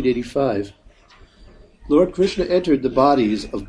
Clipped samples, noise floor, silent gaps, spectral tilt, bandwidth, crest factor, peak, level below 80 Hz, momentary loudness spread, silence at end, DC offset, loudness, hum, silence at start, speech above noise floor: under 0.1%; -49 dBFS; none; -6.5 dB/octave; 10.5 kHz; 18 dB; -2 dBFS; -42 dBFS; 6 LU; 0 s; under 0.1%; -19 LUFS; none; 0 s; 31 dB